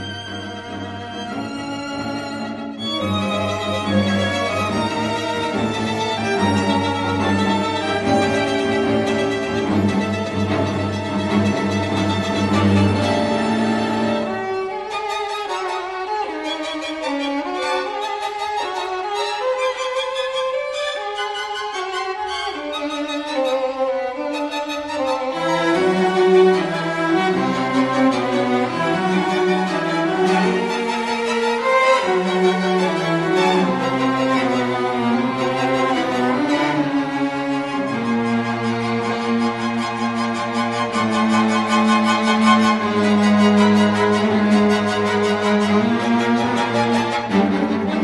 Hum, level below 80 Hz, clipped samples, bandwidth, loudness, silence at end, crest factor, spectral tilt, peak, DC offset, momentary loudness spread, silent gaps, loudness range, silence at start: none; -54 dBFS; under 0.1%; 11.5 kHz; -19 LUFS; 0 s; 18 dB; -5.5 dB/octave; -2 dBFS; under 0.1%; 8 LU; none; 7 LU; 0 s